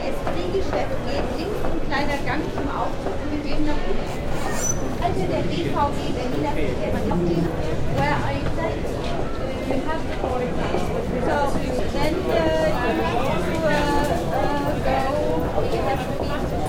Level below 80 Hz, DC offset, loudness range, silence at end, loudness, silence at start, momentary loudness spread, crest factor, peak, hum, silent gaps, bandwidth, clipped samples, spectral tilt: -30 dBFS; under 0.1%; 4 LU; 0 s; -24 LUFS; 0 s; 5 LU; 16 dB; -6 dBFS; none; none; 16 kHz; under 0.1%; -5.5 dB/octave